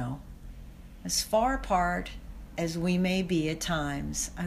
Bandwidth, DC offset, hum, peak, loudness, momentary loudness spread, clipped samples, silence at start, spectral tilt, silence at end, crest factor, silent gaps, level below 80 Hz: 15.5 kHz; under 0.1%; none; -14 dBFS; -29 LUFS; 21 LU; under 0.1%; 0 s; -4.5 dB/octave; 0 s; 16 dB; none; -44 dBFS